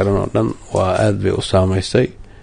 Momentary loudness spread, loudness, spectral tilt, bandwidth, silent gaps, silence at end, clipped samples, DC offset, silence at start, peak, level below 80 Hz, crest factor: 4 LU; -17 LUFS; -6.5 dB/octave; 10.5 kHz; none; 0 s; under 0.1%; under 0.1%; 0 s; -2 dBFS; -32 dBFS; 16 dB